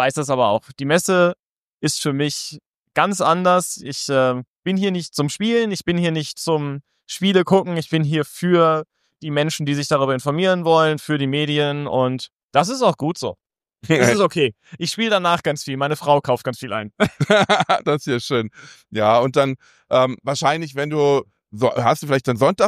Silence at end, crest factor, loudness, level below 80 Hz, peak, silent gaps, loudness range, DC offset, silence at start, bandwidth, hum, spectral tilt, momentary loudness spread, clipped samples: 0 s; 18 dB; -19 LUFS; -60 dBFS; -2 dBFS; 1.46-1.78 s, 2.66-2.84 s, 4.47-4.63 s, 12.32-12.37 s, 12.43-12.49 s; 1 LU; under 0.1%; 0 s; 15.5 kHz; none; -5 dB/octave; 10 LU; under 0.1%